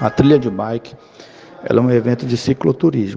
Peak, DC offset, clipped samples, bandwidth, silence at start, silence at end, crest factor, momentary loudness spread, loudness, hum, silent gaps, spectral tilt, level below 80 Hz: 0 dBFS; under 0.1%; under 0.1%; 7.8 kHz; 0 s; 0 s; 16 dB; 11 LU; -16 LUFS; none; none; -8 dB/octave; -46 dBFS